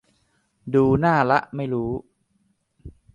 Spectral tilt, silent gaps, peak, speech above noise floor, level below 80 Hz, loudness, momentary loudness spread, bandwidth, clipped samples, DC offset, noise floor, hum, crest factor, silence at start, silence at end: -8.5 dB/octave; none; -4 dBFS; 47 dB; -48 dBFS; -21 LUFS; 13 LU; 9.6 kHz; under 0.1%; under 0.1%; -68 dBFS; none; 20 dB; 0.65 s; 0.25 s